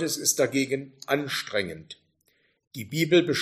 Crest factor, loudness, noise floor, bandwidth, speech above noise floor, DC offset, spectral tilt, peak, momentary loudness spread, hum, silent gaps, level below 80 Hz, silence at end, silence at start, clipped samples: 20 dB; -26 LUFS; -69 dBFS; 15.5 kHz; 43 dB; under 0.1%; -3.5 dB/octave; -8 dBFS; 21 LU; none; 2.67-2.71 s; -68 dBFS; 0 s; 0 s; under 0.1%